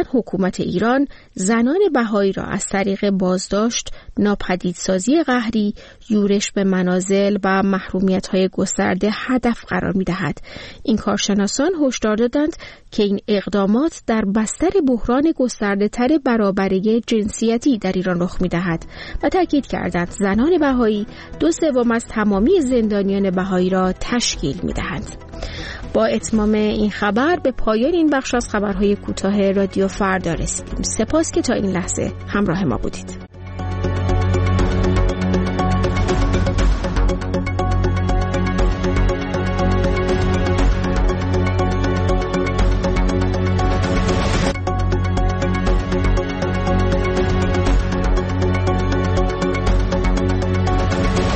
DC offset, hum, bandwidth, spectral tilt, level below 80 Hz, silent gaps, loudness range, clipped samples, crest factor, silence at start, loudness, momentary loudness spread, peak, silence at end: under 0.1%; none; 8.8 kHz; -6 dB/octave; -26 dBFS; none; 2 LU; under 0.1%; 12 dB; 0 s; -19 LUFS; 6 LU; -6 dBFS; 0 s